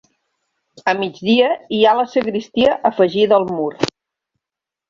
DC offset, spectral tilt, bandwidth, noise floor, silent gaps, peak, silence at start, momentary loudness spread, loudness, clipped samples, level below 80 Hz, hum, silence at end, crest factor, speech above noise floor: under 0.1%; -5.5 dB/octave; 7.6 kHz; -86 dBFS; none; -2 dBFS; 0.85 s; 8 LU; -17 LUFS; under 0.1%; -56 dBFS; none; 1 s; 16 dB; 71 dB